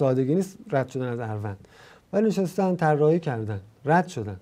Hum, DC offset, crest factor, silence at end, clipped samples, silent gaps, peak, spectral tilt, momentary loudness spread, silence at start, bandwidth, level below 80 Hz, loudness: none; under 0.1%; 18 dB; 0.05 s; under 0.1%; none; -6 dBFS; -7.5 dB/octave; 11 LU; 0 s; 15.5 kHz; -66 dBFS; -25 LUFS